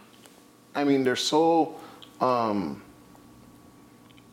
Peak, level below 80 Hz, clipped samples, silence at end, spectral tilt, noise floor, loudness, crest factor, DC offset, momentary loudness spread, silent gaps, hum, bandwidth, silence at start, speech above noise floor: -8 dBFS; -68 dBFS; under 0.1%; 1.5 s; -4.5 dB/octave; -54 dBFS; -25 LUFS; 20 dB; under 0.1%; 19 LU; none; none; 16.5 kHz; 0.75 s; 30 dB